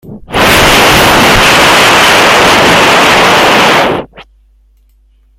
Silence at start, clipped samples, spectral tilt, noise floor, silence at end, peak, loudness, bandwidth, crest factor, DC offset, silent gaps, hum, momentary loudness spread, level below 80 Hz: 0.05 s; 1%; -2.5 dB/octave; -46 dBFS; 1.15 s; 0 dBFS; -4 LUFS; over 20 kHz; 6 dB; under 0.1%; none; none; 5 LU; -28 dBFS